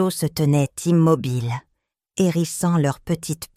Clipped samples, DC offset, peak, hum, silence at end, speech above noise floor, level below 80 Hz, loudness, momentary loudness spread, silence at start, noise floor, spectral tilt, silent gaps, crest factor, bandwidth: under 0.1%; under 0.1%; -4 dBFS; none; 0.1 s; 54 dB; -52 dBFS; -21 LUFS; 9 LU; 0 s; -74 dBFS; -6.5 dB/octave; none; 16 dB; 16 kHz